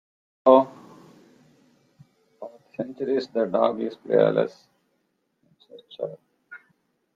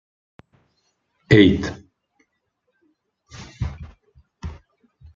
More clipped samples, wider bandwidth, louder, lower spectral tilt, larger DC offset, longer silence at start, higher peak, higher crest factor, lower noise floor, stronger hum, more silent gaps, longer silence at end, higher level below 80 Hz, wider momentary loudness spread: neither; about the same, 7.2 kHz vs 7.6 kHz; second, -23 LUFS vs -18 LUFS; about the same, -7.5 dB/octave vs -7 dB/octave; neither; second, 0.45 s vs 1.3 s; about the same, -2 dBFS vs -2 dBFS; about the same, 24 dB vs 24 dB; about the same, -73 dBFS vs -73 dBFS; neither; neither; about the same, 0.6 s vs 0.6 s; second, -76 dBFS vs -44 dBFS; second, 24 LU vs 28 LU